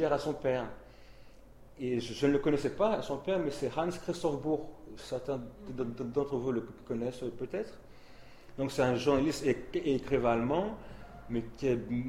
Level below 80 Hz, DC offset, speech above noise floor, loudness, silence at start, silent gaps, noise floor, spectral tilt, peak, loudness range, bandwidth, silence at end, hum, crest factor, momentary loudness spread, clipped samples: -54 dBFS; under 0.1%; 21 dB; -33 LUFS; 0 s; none; -54 dBFS; -6.5 dB/octave; -14 dBFS; 5 LU; 15.5 kHz; 0 s; none; 20 dB; 11 LU; under 0.1%